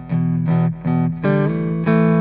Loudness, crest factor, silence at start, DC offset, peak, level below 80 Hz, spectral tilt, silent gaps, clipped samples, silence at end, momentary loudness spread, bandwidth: -18 LUFS; 14 dB; 0 s; under 0.1%; -4 dBFS; -44 dBFS; -9 dB/octave; none; under 0.1%; 0 s; 4 LU; 4.1 kHz